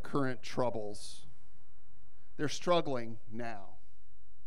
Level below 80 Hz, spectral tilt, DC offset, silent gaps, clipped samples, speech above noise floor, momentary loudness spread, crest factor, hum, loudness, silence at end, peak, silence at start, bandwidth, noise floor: -66 dBFS; -5 dB/octave; 3%; none; under 0.1%; 30 dB; 18 LU; 22 dB; none; -37 LUFS; 0.7 s; -18 dBFS; 0.05 s; 14.5 kHz; -66 dBFS